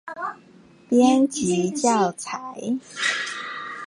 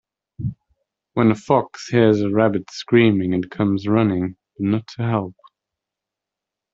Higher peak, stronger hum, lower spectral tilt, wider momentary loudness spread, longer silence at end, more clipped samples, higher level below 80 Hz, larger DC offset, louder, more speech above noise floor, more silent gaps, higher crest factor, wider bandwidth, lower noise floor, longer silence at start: second, -6 dBFS vs -2 dBFS; neither; second, -4 dB/octave vs -7.5 dB/octave; about the same, 14 LU vs 13 LU; second, 0 s vs 1.45 s; neither; second, -64 dBFS vs -54 dBFS; neither; second, -23 LUFS vs -20 LUFS; second, 30 dB vs 67 dB; neither; about the same, 16 dB vs 18 dB; first, 11 kHz vs 7.8 kHz; second, -51 dBFS vs -85 dBFS; second, 0.05 s vs 0.4 s